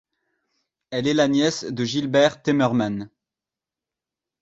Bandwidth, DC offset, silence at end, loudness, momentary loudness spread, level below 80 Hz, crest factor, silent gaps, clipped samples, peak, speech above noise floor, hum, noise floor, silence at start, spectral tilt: 8 kHz; under 0.1%; 1.35 s; -21 LUFS; 11 LU; -62 dBFS; 18 dB; none; under 0.1%; -4 dBFS; 68 dB; none; -89 dBFS; 0.9 s; -5 dB/octave